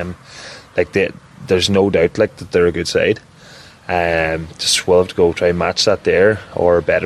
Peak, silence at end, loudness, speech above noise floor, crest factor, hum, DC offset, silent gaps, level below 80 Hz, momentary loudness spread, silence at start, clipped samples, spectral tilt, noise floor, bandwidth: -2 dBFS; 0 s; -16 LUFS; 25 dB; 14 dB; none; under 0.1%; none; -42 dBFS; 11 LU; 0 s; under 0.1%; -4 dB/octave; -41 dBFS; 13 kHz